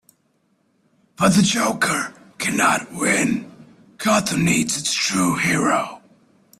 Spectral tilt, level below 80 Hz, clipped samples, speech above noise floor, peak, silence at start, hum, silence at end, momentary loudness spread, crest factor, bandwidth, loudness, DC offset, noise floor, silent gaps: -3.5 dB/octave; -54 dBFS; under 0.1%; 46 dB; -4 dBFS; 1.2 s; none; 0.6 s; 8 LU; 18 dB; 15 kHz; -19 LUFS; under 0.1%; -65 dBFS; none